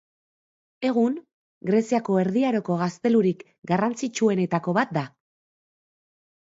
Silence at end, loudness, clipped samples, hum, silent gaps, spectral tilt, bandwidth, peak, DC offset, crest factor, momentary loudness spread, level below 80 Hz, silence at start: 1.4 s; -24 LUFS; under 0.1%; none; 1.33-1.61 s; -6.5 dB/octave; 7.8 kHz; -8 dBFS; under 0.1%; 18 dB; 8 LU; -70 dBFS; 0.8 s